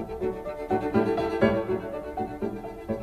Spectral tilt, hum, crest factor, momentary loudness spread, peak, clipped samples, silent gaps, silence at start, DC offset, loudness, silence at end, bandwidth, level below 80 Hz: -8 dB/octave; none; 20 dB; 10 LU; -8 dBFS; under 0.1%; none; 0 s; under 0.1%; -28 LUFS; 0 s; 14 kHz; -48 dBFS